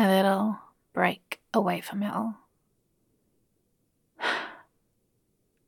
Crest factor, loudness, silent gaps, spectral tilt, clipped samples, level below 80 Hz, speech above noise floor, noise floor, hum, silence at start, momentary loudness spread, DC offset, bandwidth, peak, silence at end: 22 dB; -28 LUFS; none; -6 dB/octave; under 0.1%; -78 dBFS; 44 dB; -73 dBFS; none; 0 s; 14 LU; under 0.1%; 17.5 kHz; -8 dBFS; 1.1 s